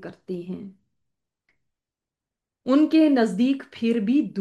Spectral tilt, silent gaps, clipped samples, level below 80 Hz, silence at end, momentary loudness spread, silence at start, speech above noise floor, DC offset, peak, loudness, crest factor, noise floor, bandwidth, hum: -7 dB/octave; none; under 0.1%; -74 dBFS; 0 s; 18 LU; 0 s; 67 dB; under 0.1%; -8 dBFS; -21 LUFS; 16 dB; -89 dBFS; 10 kHz; none